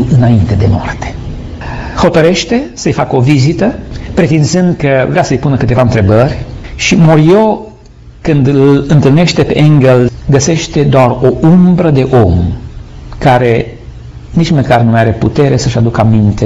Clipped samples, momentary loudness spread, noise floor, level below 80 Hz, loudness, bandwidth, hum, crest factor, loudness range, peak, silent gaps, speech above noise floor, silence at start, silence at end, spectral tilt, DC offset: under 0.1%; 14 LU; -33 dBFS; -26 dBFS; -9 LUFS; 8 kHz; none; 8 dB; 3 LU; 0 dBFS; none; 26 dB; 0 s; 0 s; -6.5 dB/octave; under 0.1%